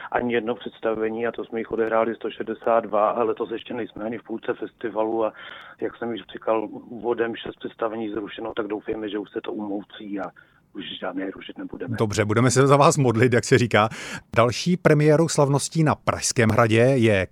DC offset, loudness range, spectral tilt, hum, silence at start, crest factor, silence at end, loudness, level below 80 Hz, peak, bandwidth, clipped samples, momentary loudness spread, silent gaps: under 0.1%; 11 LU; -5.5 dB/octave; none; 0 s; 20 dB; 0.05 s; -23 LUFS; -56 dBFS; -2 dBFS; 14.5 kHz; under 0.1%; 15 LU; none